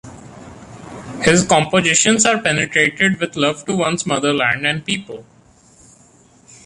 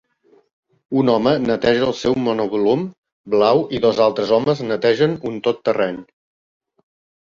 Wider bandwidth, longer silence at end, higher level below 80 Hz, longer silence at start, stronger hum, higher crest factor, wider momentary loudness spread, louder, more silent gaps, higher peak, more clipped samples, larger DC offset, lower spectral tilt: first, 11.5 kHz vs 7.4 kHz; first, 1.45 s vs 1.2 s; about the same, -50 dBFS vs -54 dBFS; second, 0.05 s vs 0.9 s; neither; about the same, 18 dB vs 18 dB; first, 21 LU vs 6 LU; first, -15 LUFS vs -18 LUFS; second, none vs 2.98-3.03 s, 3.12-3.24 s; about the same, -2 dBFS vs -2 dBFS; neither; neither; second, -3 dB/octave vs -6.5 dB/octave